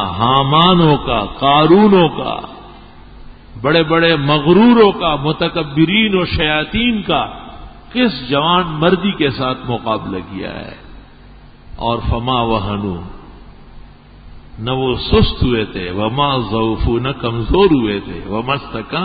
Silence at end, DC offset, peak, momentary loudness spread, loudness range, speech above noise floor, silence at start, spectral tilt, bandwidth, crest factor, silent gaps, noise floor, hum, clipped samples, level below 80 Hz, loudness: 0 s; under 0.1%; 0 dBFS; 14 LU; 9 LU; 25 dB; 0 s; -10 dB/octave; 5 kHz; 16 dB; none; -39 dBFS; none; under 0.1%; -30 dBFS; -14 LUFS